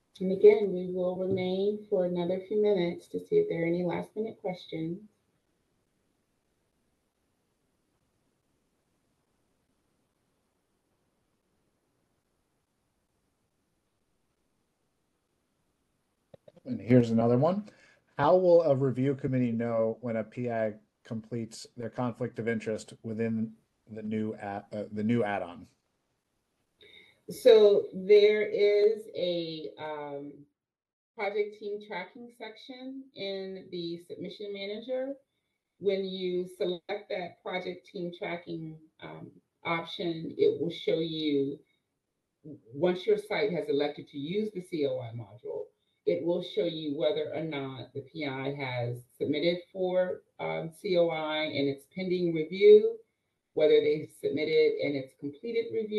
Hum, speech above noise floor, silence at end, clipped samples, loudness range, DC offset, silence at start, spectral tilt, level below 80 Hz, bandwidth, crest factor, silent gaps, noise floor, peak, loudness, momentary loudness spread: none; 54 dB; 0 s; under 0.1%; 12 LU; under 0.1%; 0.2 s; -7 dB/octave; -74 dBFS; 12 kHz; 22 dB; 30.93-31.14 s; -83 dBFS; -8 dBFS; -29 LUFS; 18 LU